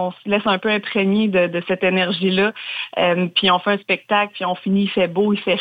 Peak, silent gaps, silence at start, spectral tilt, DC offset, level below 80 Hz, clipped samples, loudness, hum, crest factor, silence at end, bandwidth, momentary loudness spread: -4 dBFS; none; 0 s; -7.5 dB/octave; under 0.1%; -62 dBFS; under 0.1%; -19 LUFS; none; 14 dB; 0 s; 5 kHz; 4 LU